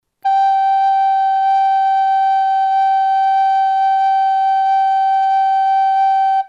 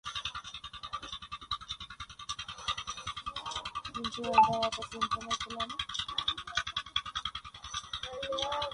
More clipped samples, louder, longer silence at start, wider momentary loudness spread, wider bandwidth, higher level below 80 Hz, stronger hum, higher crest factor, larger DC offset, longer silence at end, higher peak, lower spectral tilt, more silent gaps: neither; first, -14 LUFS vs -35 LUFS; first, 0.25 s vs 0.05 s; second, 1 LU vs 13 LU; second, 6.8 kHz vs 11.5 kHz; second, -82 dBFS vs -58 dBFS; neither; second, 6 dB vs 24 dB; neither; about the same, 0 s vs 0 s; about the same, -8 dBFS vs -10 dBFS; second, 2.5 dB/octave vs -2 dB/octave; neither